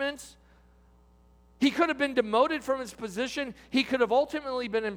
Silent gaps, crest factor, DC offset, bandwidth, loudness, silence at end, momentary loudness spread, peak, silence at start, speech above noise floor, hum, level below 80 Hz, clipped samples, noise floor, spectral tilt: none; 18 dB; under 0.1%; 16.5 kHz; -28 LUFS; 0 s; 9 LU; -10 dBFS; 0 s; 31 dB; none; -60 dBFS; under 0.1%; -59 dBFS; -4 dB/octave